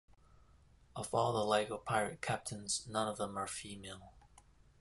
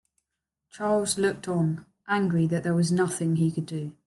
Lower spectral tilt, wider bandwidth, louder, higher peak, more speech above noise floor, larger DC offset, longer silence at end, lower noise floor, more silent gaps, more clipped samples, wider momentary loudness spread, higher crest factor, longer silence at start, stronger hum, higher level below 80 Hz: second, -3.5 dB/octave vs -6 dB/octave; about the same, 12 kHz vs 12.5 kHz; second, -37 LUFS vs -26 LUFS; second, -18 dBFS vs -12 dBFS; second, 27 dB vs 59 dB; neither; first, 0.4 s vs 0.15 s; second, -65 dBFS vs -85 dBFS; neither; neither; first, 15 LU vs 8 LU; first, 22 dB vs 14 dB; first, 0.95 s vs 0.75 s; neither; about the same, -66 dBFS vs -64 dBFS